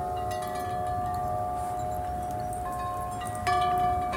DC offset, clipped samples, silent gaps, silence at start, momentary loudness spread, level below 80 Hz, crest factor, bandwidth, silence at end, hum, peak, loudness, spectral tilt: under 0.1%; under 0.1%; none; 0 s; 7 LU; -44 dBFS; 14 dB; 17 kHz; 0 s; none; -14 dBFS; -30 LUFS; -5 dB/octave